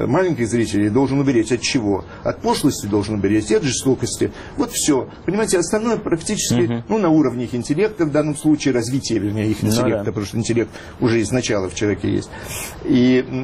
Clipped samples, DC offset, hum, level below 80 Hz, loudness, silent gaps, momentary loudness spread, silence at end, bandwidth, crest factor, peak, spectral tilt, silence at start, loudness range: under 0.1%; under 0.1%; none; -44 dBFS; -19 LUFS; none; 6 LU; 0 s; 14.5 kHz; 12 dB; -6 dBFS; -5 dB/octave; 0 s; 1 LU